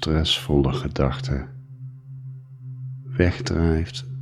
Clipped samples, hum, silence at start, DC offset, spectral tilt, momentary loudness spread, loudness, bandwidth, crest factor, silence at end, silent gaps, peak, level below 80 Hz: under 0.1%; none; 0 s; under 0.1%; -6 dB/octave; 19 LU; -23 LUFS; 14 kHz; 22 dB; 0 s; none; -2 dBFS; -34 dBFS